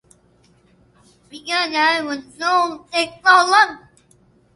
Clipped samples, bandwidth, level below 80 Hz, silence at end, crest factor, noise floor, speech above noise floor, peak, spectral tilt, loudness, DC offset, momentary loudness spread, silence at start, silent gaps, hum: under 0.1%; 11.5 kHz; -64 dBFS; 0.75 s; 20 dB; -56 dBFS; 38 dB; 0 dBFS; -1 dB/octave; -17 LUFS; under 0.1%; 11 LU; 1.35 s; none; none